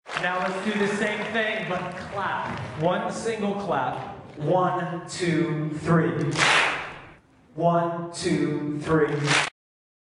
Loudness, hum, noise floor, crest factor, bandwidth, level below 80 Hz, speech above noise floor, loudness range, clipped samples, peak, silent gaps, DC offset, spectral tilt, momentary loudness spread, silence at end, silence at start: -25 LUFS; none; -51 dBFS; 22 dB; 11 kHz; -58 dBFS; 27 dB; 3 LU; under 0.1%; -4 dBFS; none; under 0.1%; -5 dB/octave; 10 LU; 0.65 s; 0.05 s